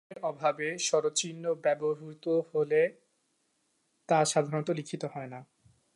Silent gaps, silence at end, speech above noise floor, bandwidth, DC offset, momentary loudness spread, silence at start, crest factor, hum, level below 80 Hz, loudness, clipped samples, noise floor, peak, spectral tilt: none; 0.55 s; 45 dB; 11.5 kHz; under 0.1%; 11 LU; 0.1 s; 18 dB; none; -82 dBFS; -30 LUFS; under 0.1%; -75 dBFS; -14 dBFS; -4 dB/octave